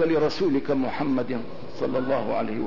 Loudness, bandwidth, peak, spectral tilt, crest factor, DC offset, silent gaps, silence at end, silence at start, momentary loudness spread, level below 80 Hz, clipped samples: -26 LUFS; 6 kHz; -12 dBFS; -7 dB/octave; 12 dB; 2%; none; 0 s; 0 s; 8 LU; -56 dBFS; under 0.1%